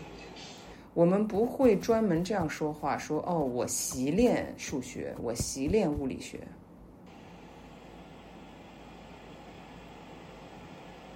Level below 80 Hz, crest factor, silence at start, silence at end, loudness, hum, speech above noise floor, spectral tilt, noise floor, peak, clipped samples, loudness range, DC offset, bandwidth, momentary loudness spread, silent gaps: -54 dBFS; 20 dB; 0 s; 0 s; -30 LUFS; none; 23 dB; -5.5 dB/octave; -52 dBFS; -12 dBFS; under 0.1%; 20 LU; under 0.1%; 16 kHz; 24 LU; none